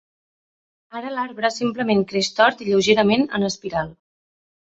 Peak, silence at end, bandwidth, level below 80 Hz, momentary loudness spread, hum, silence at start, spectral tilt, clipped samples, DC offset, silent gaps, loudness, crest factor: -2 dBFS; 0.75 s; 8 kHz; -58 dBFS; 12 LU; none; 0.95 s; -4.5 dB/octave; under 0.1%; under 0.1%; none; -20 LUFS; 20 dB